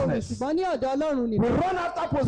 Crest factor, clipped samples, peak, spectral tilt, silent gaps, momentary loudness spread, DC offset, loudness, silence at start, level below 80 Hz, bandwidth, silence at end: 8 dB; under 0.1%; -16 dBFS; -7 dB/octave; none; 4 LU; under 0.1%; -26 LUFS; 0 s; -46 dBFS; 10 kHz; 0 s